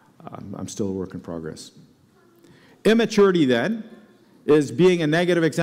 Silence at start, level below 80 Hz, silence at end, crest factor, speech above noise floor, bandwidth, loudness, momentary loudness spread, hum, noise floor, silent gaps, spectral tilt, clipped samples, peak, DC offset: 0.25 s; -60 dBFS; 0 s; 14 dB; 36 dB; 15 kHz; -20 LUFS; 19 LU; none; -56 dBFS; none; -6 dB/octave; under 0.1%; -8 dBFS; under 0.1%